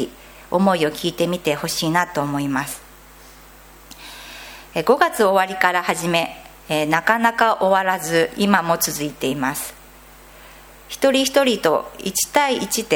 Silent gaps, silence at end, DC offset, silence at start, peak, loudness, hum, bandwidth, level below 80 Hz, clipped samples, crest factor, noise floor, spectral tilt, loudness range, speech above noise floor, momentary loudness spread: none; 0 s; under 0.1%; 0 s; 0 dBFS; -19 LUFS; none; 17.5 kHz; -52 dBFS; under 0.1%; 20 dB; -44 dBFS; -3.5 dB/octave; 6 LU; 25 dB; 15 LU